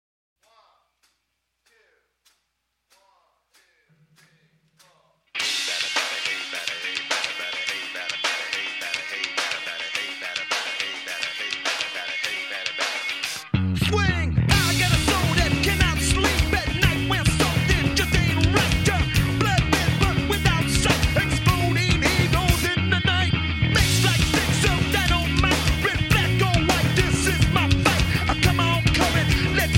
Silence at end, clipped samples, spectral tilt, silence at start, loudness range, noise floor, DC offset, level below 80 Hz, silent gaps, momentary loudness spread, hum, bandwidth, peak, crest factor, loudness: 0 s; under 0.1%; -4 dB/octave; 5.35 s; 6 LU; -76 dBFS; under 0.1%; -32 dBFS; none; 7 LU; none; 17 kHz; -4 dBFS; 20 dB; -21 LUFS